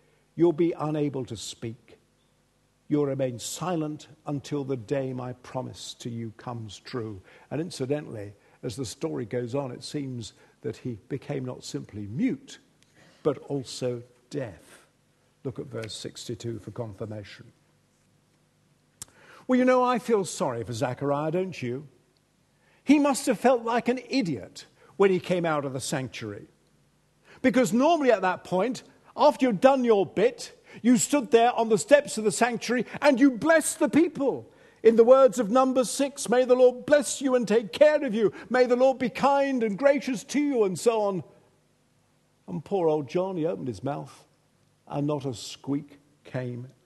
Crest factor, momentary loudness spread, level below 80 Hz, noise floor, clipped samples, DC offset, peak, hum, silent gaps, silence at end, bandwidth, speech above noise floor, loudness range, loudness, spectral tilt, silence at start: 22 dB; 17 LU; -68 dBFS; -67 dBFS; under 0.1%; under 0.1%; -4 dBFS; none; none; 0.15 s; 12.5 kHz; 41 dB; 13 LU; -26 LUFS; -5 dB/octave; 0.35 s